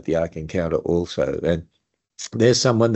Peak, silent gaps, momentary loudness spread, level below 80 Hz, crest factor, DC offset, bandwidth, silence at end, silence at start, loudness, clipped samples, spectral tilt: -2 dBFS; none; 10 LU; -46 dBFS; 18 dB; under 0.1%; 8.2 kHz; 0 s; 0.05 s; -21 LUFS; under 0.1%; -5 dB/octave